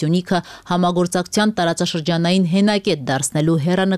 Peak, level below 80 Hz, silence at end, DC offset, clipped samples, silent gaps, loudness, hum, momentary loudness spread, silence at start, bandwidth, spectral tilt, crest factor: -6 dBFS; -54 dBFS; 0 s; 0.1%; under 0.1%; none; -18 LUFS; none; 4 LU; 0 s; 14 kHz; -5 dB/octave; 12 dB